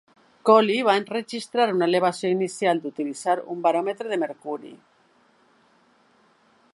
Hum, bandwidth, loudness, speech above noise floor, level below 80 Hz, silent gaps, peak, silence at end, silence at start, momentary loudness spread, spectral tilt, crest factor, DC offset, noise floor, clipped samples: none; 11.5 kHz; -23 LUFS; 38 dB; -80 dBFS; none; -4 dBFS; 2 s; 0.45 s; 12 LU; -5 dB/octave; 22 dB; under 0.1%; -61 dBFS; under 0.1%